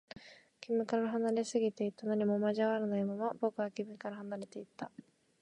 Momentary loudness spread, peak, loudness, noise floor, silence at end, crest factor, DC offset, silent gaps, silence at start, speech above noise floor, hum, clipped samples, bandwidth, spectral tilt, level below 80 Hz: 15 LU; -20 dBFS; -35 LUFS; -56 dBFS; 0.4 s; 16 dB; under 0.1%; none; 0.15 s; 21 dB; none; under 0.1%; 10.5 kHz; -6 dB/octave; -82 dBFS